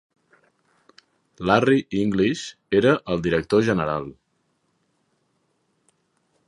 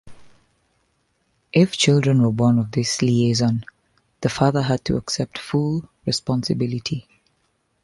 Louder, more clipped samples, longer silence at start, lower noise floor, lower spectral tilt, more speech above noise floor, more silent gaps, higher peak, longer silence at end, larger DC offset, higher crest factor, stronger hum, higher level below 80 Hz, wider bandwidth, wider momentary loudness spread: about the same, -21 LUFS vs -21 LUFS; neither; first, 1.4 s vs 0.05 s; about the same, -70 dBFS vs -68 dBFS; about the same, -6.5 dB/octave vs -5.5 dB/octave; about the same, 49 dB vs 48 dB; neither; about the same, -2 dBFS vs -2 dBFS; first, 2.35 s vs 0.8 s; neither; about the same, 22 dB vs 18 dB; neither; about the same, -52 dBFS vs -50 dBFS; about the same, 11 kHz vs 11.5 kHz; about the same, 11 LU vs 10 LU